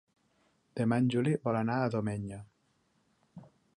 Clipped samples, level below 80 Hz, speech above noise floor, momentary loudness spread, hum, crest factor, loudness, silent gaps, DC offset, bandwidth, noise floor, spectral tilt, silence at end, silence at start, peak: under 0.1%; -66 dBFS; 43 dB; 15 LU; none; 18 dB; -31 LUFS; none; under 0.1%; 11 kHz; -73 dBFS; -8 dB/octave; 0.3 s; 0.75 s; -16 dBFS